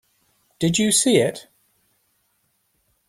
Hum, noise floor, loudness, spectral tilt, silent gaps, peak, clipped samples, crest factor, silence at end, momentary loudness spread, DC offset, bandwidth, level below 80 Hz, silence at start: none; -68 dBFS; -19 LUFS; -3.5 dB/octave; none; -4 dBFS; under 0.1%; 20 dB; 1.7 s; 9 LU; under 0.1%; 16 kHz; -60 dBFS; 0.6 s